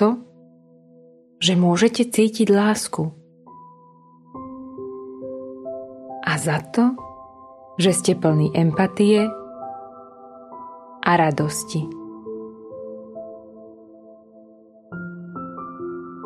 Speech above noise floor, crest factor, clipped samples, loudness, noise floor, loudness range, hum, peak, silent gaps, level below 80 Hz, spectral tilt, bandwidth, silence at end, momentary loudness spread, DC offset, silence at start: 32 dB; 20 dB; under 0.1%; -20 LUFS; -51 dBFS; 16 LU; none; -2 dBFS; none; -62 dBFS; -5 dB/octave; 13.5 kHz; 0 s; 22 LU; under 0.1%; 0 s